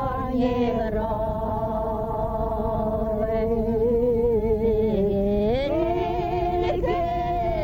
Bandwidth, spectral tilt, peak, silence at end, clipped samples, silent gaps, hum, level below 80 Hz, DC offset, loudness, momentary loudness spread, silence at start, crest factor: 17 kHz; -9 dB/octave; -10 dBFS; 0 s; under 0.1%; none; none; -34 dBFS; under 0.1%; -24 LUFS; 5 LU; 0 s; 12 dB